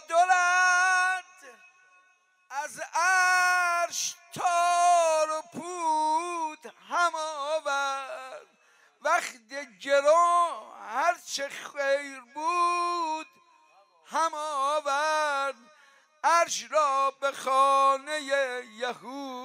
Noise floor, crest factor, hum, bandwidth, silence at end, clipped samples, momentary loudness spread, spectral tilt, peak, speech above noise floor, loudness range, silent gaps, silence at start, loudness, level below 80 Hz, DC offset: -66 dBFS; 16 dB; none; 16 kHz; 0 s; under 0.1%; 15 LU; -0.5 dB/octave; -12 dBFS; 37 dB; 5 LU; none; 0.1 s; -26 LUFS; under -90 dBFS; under 0.1%